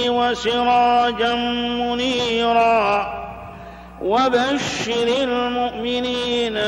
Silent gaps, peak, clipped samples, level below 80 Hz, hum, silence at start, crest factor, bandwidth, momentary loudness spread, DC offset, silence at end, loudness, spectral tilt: none; -6 dBFS; under 0.1%; -46 dBFS; none; 0 s; 14 dB; 11 kHz; 12 LU; under 0.1%; 0 s; -19 LUFS; -3.5 dB/octave